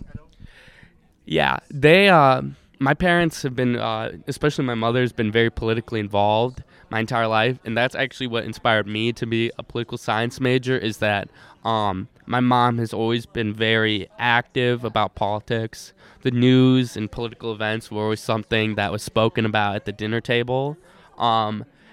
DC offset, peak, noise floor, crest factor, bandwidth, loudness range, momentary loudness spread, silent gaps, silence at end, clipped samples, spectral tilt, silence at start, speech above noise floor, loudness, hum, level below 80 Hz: under 0.1%; -2 dBFS; -53 dBFS; 20 dB; 15 kHz; 5 LU; 10 LU; none; 0.3 s; under 0.1%; -6 dB/octave; 0 s; 32 dB; -21 LUFS; none; -48 dBFS